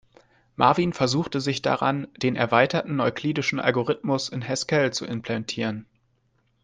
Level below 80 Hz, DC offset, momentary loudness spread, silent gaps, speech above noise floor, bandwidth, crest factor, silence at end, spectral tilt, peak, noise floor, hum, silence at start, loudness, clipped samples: -60 dBFS; under 0.1%; 9 LU; none; 44 dB; 10 kHz; 20 dB; 0.8 s; -5 dB/octave; -4 dBFS; -68 dBFS; none; 0.6 s; -24 LUFS; under 0.1%